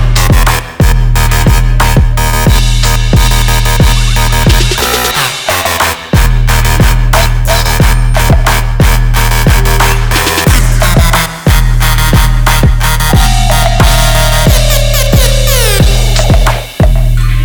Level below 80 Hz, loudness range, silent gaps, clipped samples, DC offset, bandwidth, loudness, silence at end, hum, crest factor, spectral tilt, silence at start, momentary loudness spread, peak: -10 dBFS; 1 LU; none; 1%; under 0.1%; over 20 kHz; -9 LUFS; 0 s; none; 6 dB; -4 dB/octave; 0 s; 2 LU; 0 dBFS